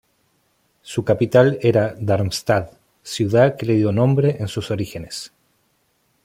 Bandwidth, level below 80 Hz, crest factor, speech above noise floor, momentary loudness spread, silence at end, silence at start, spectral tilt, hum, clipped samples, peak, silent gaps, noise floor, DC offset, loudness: 16 kHz; -52 dBFS; 18 dB; 47 dB; 15 LU; 0.95 s; 0.85 s; -6.5 dB/octave; none; under 0.1%; -2 dBFS; none; -65 dBFS; under 0.1%; -19 LUFS